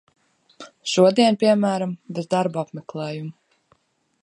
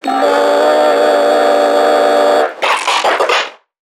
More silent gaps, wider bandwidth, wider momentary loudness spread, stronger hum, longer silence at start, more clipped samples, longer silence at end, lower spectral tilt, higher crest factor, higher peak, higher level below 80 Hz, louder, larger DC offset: neither; second, 11.5 kHz vs 16 kHz; first, 16 LU vs 3 LU; neither; first, 0.6 s vs 0.05 s; neither; first, 0.9 s vs 0.45 s; first, -5.5 dB/octave vs -1 dB/octave; first, 20 dB vs 12 dB; about the same, -2 dBFS vs 0 dBFS; second, -72 dBFS vs -66 dBFS; second, -21 LUFS vs -11 LUFS; neither